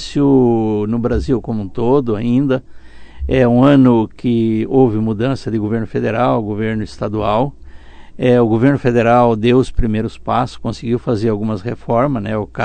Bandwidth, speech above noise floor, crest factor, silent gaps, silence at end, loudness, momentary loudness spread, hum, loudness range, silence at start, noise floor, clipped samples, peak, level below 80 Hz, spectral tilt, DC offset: 9.2 kHz; 20 dB; 14 dB; none; 0 s; -15 LUFS; 9 LU; none; 3 LU; 0 s; -34 dBFS; under 0.1%; 0 dBFS; -32 dBFS; -8 dB/octave; under 0.1%